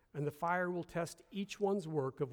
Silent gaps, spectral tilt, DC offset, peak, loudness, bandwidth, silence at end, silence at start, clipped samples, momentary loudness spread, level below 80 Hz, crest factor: none; -6 dB/octave; under 0.1%; -22 dBFS; -38 LUFS; over 20 kHz; 0 s; 0.15 s; under 0.1%; 8 LU; -72 dBFS; 16 dB